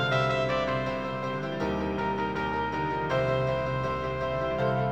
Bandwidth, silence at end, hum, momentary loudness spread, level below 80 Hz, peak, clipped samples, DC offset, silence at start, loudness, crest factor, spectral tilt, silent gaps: 8.4 kHz; 0 s; none; 5 LU; -48 dBFS; -12 dBFS; under 0.1%; 0.3%; 0 s; -29 LUFS; 16 dB; -7 dB/octave; none